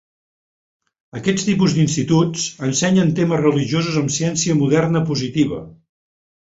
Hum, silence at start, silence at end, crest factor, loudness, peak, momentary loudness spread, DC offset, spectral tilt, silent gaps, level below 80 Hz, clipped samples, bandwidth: none; 1.15 s; 0.75 s; 16 dB; -18 LUFS; -2 dBFS; 5 LU; under 0.1%; -5 dB/octave; none; -52 dBFS; under 0.1%; 8 kHz